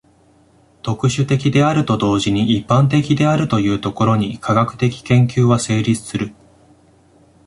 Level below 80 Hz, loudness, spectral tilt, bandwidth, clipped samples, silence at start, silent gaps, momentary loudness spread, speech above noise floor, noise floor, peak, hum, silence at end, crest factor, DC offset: -46 dBFS; -16 LUFS; -6.5 dB/octave; 11.5 kHz; under 0.1%; 0.85 s; none; 6 LU; 37 dB; -52 dBFS; -2 dBFS; none; 1.15 s; 14 dB; under 0.1%